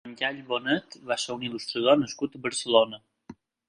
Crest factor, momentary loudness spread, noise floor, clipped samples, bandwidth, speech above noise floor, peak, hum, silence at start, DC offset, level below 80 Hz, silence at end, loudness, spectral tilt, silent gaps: 24 dB; 9 LU; -50 dBFS; under 0.1%; 11 kHz; 23 dB; -4 dBFS; none; 0.05 s; under 0.1%; -70 dBFS; 0.35 s; -27 LUFS; -3.5 dB/octave; none